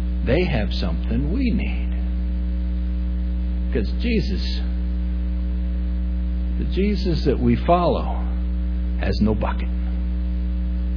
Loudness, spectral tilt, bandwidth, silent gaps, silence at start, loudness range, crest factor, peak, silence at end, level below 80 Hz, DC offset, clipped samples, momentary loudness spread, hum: -23 LUFS; -9 dB/octave; 5.4 kHz; none; 0 s; 3 LU; 16 dB; -4 dBFS; 0 s; -22 dBFS; under 0.1%; under 0.1%; 5 LU; none